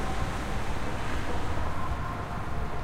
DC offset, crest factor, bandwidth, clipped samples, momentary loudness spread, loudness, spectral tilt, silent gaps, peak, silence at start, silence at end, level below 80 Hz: under 0.1%; 12 dB; 13.5 kHz; under 0.1%; 2 LU; -34 LUFS; -5.5 dB/octave; none; -16 dBFS; 0 s; 0 s; -36 dBFS